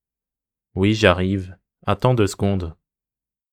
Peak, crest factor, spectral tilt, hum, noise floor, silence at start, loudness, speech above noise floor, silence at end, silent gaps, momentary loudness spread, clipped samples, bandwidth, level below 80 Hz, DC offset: 0 dBFS; 22 dB; -6 dB/octave; none; -90 dBFS; 0.75 s; -20 LUFS; 71 dB; 0.8 s; none; 16 LU; under 0.1%; 15 kHz; -50 dBFS; under 0.1%